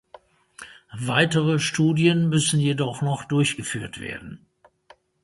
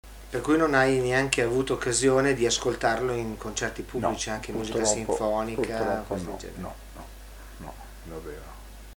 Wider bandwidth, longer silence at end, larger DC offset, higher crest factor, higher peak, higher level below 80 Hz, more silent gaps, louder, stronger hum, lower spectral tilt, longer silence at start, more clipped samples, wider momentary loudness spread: second, 11.5 kHz vs over 20 kHz; first, 0.9 s vs 0.05 s; neither; about the same, 20 dB vs 24 dB; about the same, -4 dBFS vs -2 dBFS; second, -58 dBFS vs -44 dBFS; neither; first, -22 LUFS vs -26 LUFS; neither; about the same, -5 dB/octave vs -4 dB/octave; first, 0.6 s vs 0.05 s; neither; about the same, 21 LU vs 21 LU